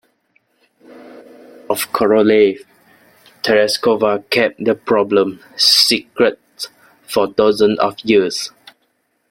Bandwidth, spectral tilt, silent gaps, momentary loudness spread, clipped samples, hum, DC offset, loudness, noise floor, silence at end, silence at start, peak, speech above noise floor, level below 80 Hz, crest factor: 16.5 kHz; -3 dB/octave; none; 13 LU; under 0.1%; none; under 0.1%; -15 LUFS; -65 dBFS; 0.85 s; 0.95 s; 0 dBFS; 50 dB; -58 dBFS; 16 dB